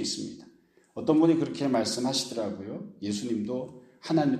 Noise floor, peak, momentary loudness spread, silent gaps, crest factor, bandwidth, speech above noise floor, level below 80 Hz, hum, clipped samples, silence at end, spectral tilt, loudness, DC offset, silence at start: -59 dBFS; -10 dBFS; 18 LU; none; 18 dB; 13.5 kHz; 32 dB; -70 dBFS; none; under 0.1%; 0 s; -5 dB/octave; -28 LUFS; under 0.1%; 0 s